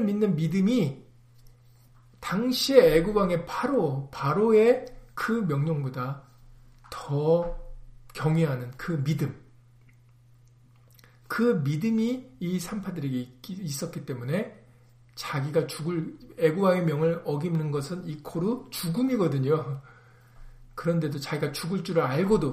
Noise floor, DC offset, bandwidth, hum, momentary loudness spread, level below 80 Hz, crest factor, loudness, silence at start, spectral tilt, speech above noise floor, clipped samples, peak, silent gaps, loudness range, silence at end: -56 dBFS; under 0.1%; 15.5 kHz; none; 13 LU; -50 dBFS; 22 dB; -27 LUFS; 0 s; -6.5 dB/octave; 30 dB; under 0.1%; -4 dBFS; none; 8 LU; 0 s